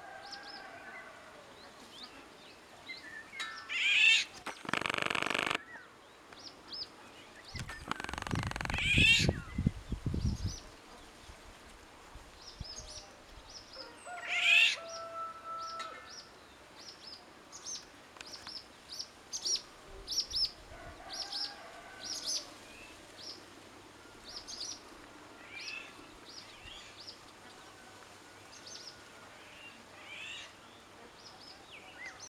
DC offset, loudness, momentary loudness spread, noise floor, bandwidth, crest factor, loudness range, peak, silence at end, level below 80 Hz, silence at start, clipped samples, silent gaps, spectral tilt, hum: under 0.1%; -33 LUFS; 24 LU; -56 dBFS; 17.5 kHz; 26 dB; 18 LU; -12 dBFS; 0.1 s; -54 dBFS; 0 s; under 0.1%; none; -2.5 dB/octave; none